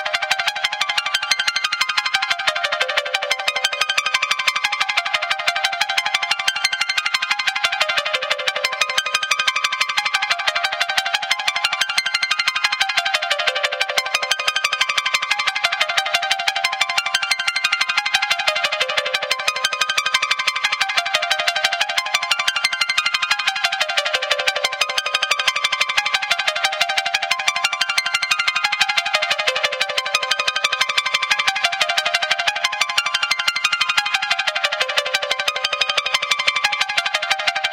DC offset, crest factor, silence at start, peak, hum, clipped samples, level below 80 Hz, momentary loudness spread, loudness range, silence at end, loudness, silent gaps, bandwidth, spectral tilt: under 0.1%; 20 dB; 0 s; 0 dBFS; none; under 0.1%; -66 dBFS; 2 LU; 1 LU; 0 s; -18 LUFS; none; 17 kHz; 2 dB/octave